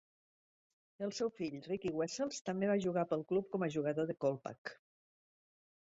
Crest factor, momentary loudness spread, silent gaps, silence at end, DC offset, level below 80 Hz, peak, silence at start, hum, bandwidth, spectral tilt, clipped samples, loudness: 16 dB; 10 LU; 2.41-2.45 s, 4.58-4.65 s; 1.2 s; under 0.1%; -76 dBFS; -22 dBFS; 1 s; none; 7.6 kHz; -5.5 dB/octave; under 0.1%; -38 LUFS